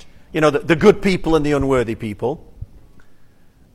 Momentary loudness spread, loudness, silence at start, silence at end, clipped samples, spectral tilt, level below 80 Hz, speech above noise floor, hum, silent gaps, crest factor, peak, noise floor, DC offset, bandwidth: 11 LU; -17 LUFS; 0.05 s; 0.5 s; under 0.1%; -6.5 dB/octave; -36 dBFS; 31 dB; none; none; 18 dB; 0 dBFS; -47 dBFS; under 0.1%; 13.5 kHz